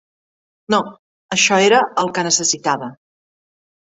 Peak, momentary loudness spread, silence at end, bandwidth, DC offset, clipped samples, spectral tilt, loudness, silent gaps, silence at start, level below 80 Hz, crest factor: -2 dBFS; 11 LU; 0.95 s; 8.4 kHz; under 0.1%; under 0.1%; -2 dB/octave; -16 LUFS; 0.99-1.29 s; 0.7 s; -62 dBFS; 18 dB